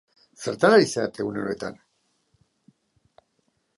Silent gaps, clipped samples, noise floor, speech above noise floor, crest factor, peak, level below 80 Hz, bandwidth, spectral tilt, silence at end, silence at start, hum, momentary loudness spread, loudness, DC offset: none; under 0.1%; -71 dBFS; 49 dB; 22 dB; -4 dBFS; -66 dBFS; 11.5 kHz; -4.5 dB/octave; 2.05 s; 0.4 s; none; 16 LU; -23 LUFS; under 0.1%